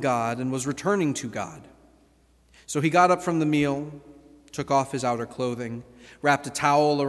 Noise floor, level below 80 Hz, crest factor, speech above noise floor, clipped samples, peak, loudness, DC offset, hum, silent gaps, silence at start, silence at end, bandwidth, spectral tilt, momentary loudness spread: -60 dBFS; -60 dBFS; 20 dB; 36 dB; under 0.1%; -6 dBFS; -25 LUFS; under 0.1%; none; none; 0 s; 0 s; 12.5 kHz; -5 dB/octave; 15 LU